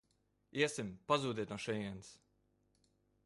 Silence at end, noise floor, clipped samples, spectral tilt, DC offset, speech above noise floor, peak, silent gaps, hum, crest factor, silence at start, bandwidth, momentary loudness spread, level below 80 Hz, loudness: 1.1 s; -79 dBFS; under 0.1%; -4.5 dB/octave; under 0.1%; 40 dB; -18 dBFS; none; 50 Hz at -65 dBFS; 24 dB; 0.55 s; 11.5 kHz; 12 LU; -72 dBFS; -39 LUFS